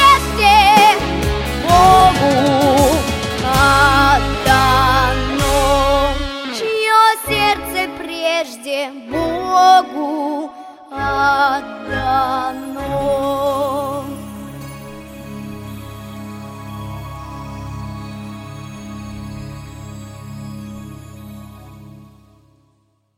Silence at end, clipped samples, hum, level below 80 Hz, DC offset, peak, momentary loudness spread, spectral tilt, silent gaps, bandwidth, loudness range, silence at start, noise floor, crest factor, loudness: 1.35 s; under 0.1%; none; -30 dBFS; under 0.1%; 0 dBFS; 22 LU; -4 dB/octave; none; 16.5 kHz; 19 LU; 0 s; -61 dBFS; 16 dB; -14 LUFS